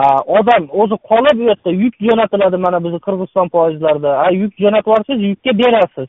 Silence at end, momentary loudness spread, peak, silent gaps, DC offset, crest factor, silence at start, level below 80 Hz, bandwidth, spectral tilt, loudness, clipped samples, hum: 0 s; 5 LU; 0 dBFS; none; under 0.1%; 12 dB; 0 s; -54 dBFS; 6.4 kHz; -4.5 dB/octave; -13 LUFS; under 0.1%; none